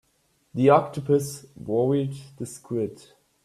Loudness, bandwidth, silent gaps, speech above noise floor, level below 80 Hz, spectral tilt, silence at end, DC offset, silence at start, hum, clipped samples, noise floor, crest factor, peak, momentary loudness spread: -24 LUFS; 14 kHz; none; 44 dB; -62 dBFS; -7 dB/octave; 0.5 s; under 0.1%; 0.55 s; none; under 0.1%; -68 dBFS; 20 dB; -6 dBFS; 18 LU